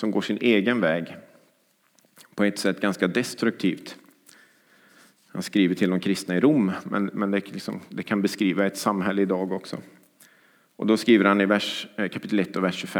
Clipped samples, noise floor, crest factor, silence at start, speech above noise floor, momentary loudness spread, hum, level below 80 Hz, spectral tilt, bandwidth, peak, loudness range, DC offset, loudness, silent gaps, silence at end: under 0.1%; -65 dBFS; 22 dB; 0 s; 41 dB; 14 LU; none; -78 dBFS; -5.5 dB/octave; 18 kHz; -4 dBFS; 4 LU; under 0.1%; -24 LUFS; none; 0 s